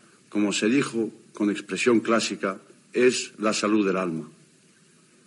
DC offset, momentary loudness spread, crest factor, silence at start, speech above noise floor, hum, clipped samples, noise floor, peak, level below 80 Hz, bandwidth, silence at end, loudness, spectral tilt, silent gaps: under 0.1%; 10 LU; 18 dB; 0.3 s; 34 dB; none; under 0.1%; -58 dBFS; -8 dBFS; -82 dBFS; 11.5 kHz; 0.95 s; -25 LUFS; -4 dB/octave; none